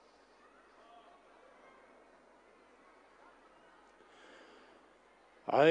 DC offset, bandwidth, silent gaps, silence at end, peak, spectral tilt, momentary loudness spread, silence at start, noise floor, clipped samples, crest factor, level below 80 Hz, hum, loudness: under 0.1%; 9.6 kHz; none; 0 s; -14 dBFS; -6 dB/octave; 9 LU; 5.5 s; -64 dBFS; under 0.1%; 26 dB; -82 dBFS; none; -32 LUFS